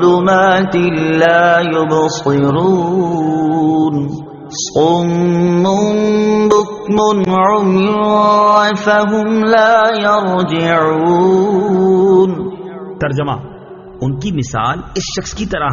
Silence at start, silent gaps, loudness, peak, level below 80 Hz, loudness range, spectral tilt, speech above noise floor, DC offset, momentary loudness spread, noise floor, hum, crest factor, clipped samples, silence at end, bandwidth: 0 s; none; -12 LUFS; 0 dBFS; -42 dBFS; 4 LU; -5 dB/octave; 21 dB; under 0.1%; 11 LU; -33 dBFS; none; 12 dB; under 0.1%; 0 s; 7.4 kHz